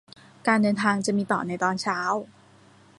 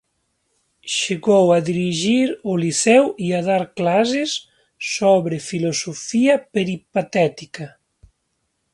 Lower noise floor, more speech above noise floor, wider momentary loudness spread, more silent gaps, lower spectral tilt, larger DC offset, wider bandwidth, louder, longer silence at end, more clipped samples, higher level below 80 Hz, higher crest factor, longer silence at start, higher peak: second, -54 dBFS vs -72 dBFS; second, 30 dB vs 53 dB; second, 6 LU vs 11 LU; neither; about the same, -5 dB/octave vs -4.5 dB/octave; neither; about the same, 11.5 kHz vs 11.5 kHz; second, -25 LUFS vs -19 LUFS; second, 0.75 s vs 1.05 s; neither; second, -68 dBFS vs -62 dBFS; about the same, 20 dB vs 18 dB; second, 0.45 s vs 0.85 s; second, -6 dBFS vs 0 dBFS